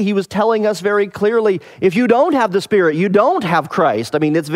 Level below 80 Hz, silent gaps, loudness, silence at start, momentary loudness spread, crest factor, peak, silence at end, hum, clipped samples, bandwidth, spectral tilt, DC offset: -58 dBFS; none; -15 LUFS; 0 s; 4 LU; 14 dB; 0 dBFS; 0 s; none; under 0.1%; 15 kHz; -6.5 dB/octave; under 0.1%